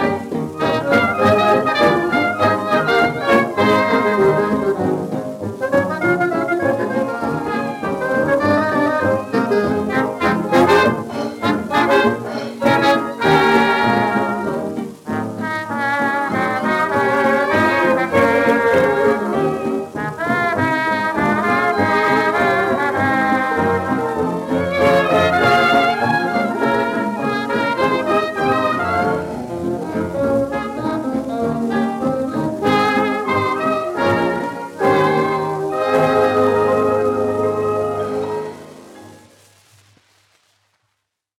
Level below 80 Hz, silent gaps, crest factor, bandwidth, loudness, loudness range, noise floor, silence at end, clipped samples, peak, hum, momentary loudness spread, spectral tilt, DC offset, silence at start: -52 dBFS; none; 16 dB; 16.5 kHz; -17 LUFS; 4 LU; -73 dBFS; 2.25 s; under 0.1%; -2 dBFS; none; 8 LU; -6 dB/octave; under 0.1%; 0 s